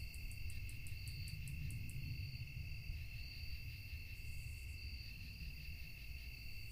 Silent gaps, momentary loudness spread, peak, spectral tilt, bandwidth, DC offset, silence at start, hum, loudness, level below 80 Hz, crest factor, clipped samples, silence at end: none; 4 LU; -32 dBFS; -4 dB/octave; 15.5 kHz; under 0.1%; 0 s; none; -50 LUFS; -52 dBFS; 16 dB; under 0.1%; 0 s